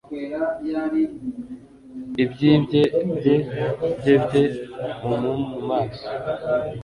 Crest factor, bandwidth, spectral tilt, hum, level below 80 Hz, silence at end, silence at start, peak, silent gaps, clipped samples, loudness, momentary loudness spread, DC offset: 18 dB; 11 kHz; -8 dB/octave; none; -52 dBFS; 0 s; 0.1 s; -4 dBFS; none; under 0.1%; -22 LUFS; 14 LU; under 0.1%